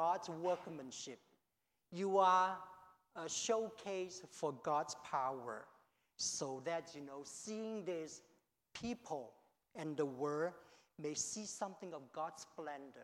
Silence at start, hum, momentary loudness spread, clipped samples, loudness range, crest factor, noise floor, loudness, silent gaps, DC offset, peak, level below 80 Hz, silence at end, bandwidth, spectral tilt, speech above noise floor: 0 s; none; 14 LU; under 0.1%; 7 LU; 22 dB; -87 dBFS; -42 LUFS; none; under 0.1%; -20 dBFS; -82 dBFS; 0 s; 16.5 kHz; -3 dB/octave; 46 dB